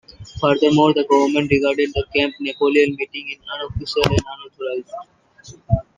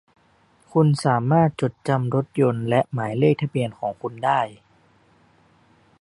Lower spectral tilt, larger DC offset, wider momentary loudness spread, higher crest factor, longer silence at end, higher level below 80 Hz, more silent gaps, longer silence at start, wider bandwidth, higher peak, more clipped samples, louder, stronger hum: second, -6 dB/octave vs -7.5 dB/octave; neither; first, 14 LU vs 8 LU; about the same, 20 dB vs 18 dB; second, 0.15 s vs 1.45 s; first, -40 dBFS vs -60 dBFS; neither; second, 0.2 s vs 0.75 s; about the same, 11 kHz vs 11 kHz; first, 0 dBFS vs -4 dBFS; neither; first, -19 LUFS vs -22 LUFS; neither